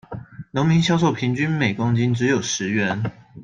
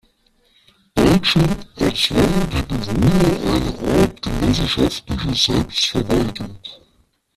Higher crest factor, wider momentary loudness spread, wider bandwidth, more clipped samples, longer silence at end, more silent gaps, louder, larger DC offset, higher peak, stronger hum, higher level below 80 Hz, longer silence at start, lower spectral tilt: about the same, 16 dB vs 16 dB; about the same, 11 LU vs 9 LU; second, 9.2 kHz vs 15 kHz; neither; second, 0 s vs 0.6 s; neither; second, -21 LUFS vs -18 LUFS; neither; second, -6 dBFS vs -2 dBFS; neither; second, -54 dBFS vs -32 dBFS; second, 0.1 s vs 0.95 s; about the same, -5.5 dB/octave vs -5.5 dB/octave